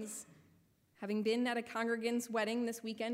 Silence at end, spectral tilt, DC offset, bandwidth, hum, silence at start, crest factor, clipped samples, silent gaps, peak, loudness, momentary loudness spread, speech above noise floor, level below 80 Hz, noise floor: 0 s; -4 dB/octave; under 0.1%; 16 kHz; none; 0 s; 14 dB; under 0.1%; none; -24 dBFS; -37 LUFS; 13 LU; 33 dB; -86 dBFS; -70 dBFS